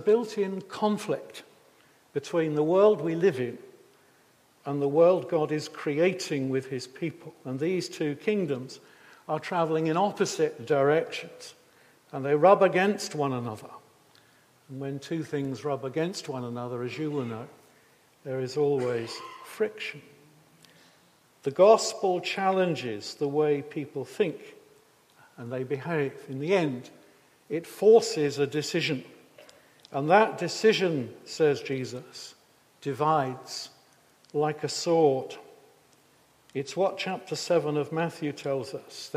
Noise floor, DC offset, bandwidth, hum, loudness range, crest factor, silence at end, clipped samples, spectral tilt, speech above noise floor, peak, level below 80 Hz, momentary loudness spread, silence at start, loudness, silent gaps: -62 dBFS; under 0.1%; 15 kHz; none; 7 LU; 22 dB; 0 s; under 0.1%; -5.5 dB/octave; 35 dB; -6 dBFS; -78 dBFS; 17 LU; 0 s; -27 LUFS; none